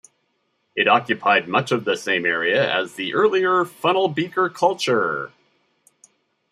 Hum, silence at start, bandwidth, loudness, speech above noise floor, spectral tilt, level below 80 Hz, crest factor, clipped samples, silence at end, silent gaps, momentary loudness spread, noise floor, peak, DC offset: none; 0.75 s; 13.5 kHz; -20 LUFS; 50 dB; -4.5 dB/octave; -72 dBFS; 18 dB; under 0.1%; 1.25 s; none; 6 LU; -70 dBFS; -2 dBFS; under 0.1%